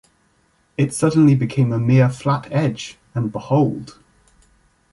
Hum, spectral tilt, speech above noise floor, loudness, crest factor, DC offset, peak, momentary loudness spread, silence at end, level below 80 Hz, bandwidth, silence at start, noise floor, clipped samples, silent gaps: none; -7.5 dB/octave; 44 dB; -18 LUFS; 16 dB; under 0.1%; -4 dBFS; 13 LU; 1 s; -54 dBFS; 11.5 kHz; 0.8 s; -61 dBFS; under 0.1%; none